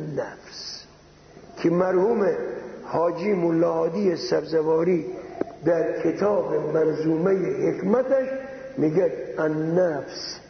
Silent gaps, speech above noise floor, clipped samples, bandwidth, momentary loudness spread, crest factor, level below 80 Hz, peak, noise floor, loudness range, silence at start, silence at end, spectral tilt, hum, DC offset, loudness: none; 27 dB; under 0.1%; 6.6 kHz; 12 LU; 18 dB; -62 dBFS; -6 dBFS; -50 dBFS; 1 LU; 0 s; 0 s; -7 dB/octave; none; under 0.1%; -24 LUFS